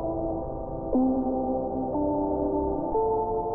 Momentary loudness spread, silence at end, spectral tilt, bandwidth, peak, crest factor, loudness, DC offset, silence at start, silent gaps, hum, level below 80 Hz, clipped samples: 6 LU; 0 s; -9.5 dB/octave; 1.7 kHz; -14 dBFS; 12 dB; -28 LUFS; under 0.1%; 0 s; none; none; -42 dBFS; under 0.1%